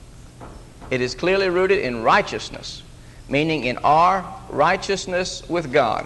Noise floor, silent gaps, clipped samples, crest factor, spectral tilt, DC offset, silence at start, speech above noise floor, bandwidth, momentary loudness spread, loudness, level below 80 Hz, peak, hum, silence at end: -40 dBFS; none; under 0.1%; 18 dB; -4.5 dB/octave; under 0.1%; 0 s; 20 dB; 12 kHz; 16 LU; -20 LUFS; -44 dBFS; -4 dBFS; none; 0 s